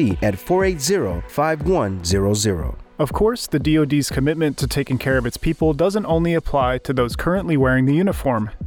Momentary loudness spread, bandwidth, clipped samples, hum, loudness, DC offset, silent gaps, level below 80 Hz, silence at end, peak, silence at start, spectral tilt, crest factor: 5 LU; over 20 kHz; under 0.1%; none; -19 LUFS; under 0.1%; none; -32 dBFS; 0 s; -6 dBFS; 0 s; -5.5 dB/octave; 12 dB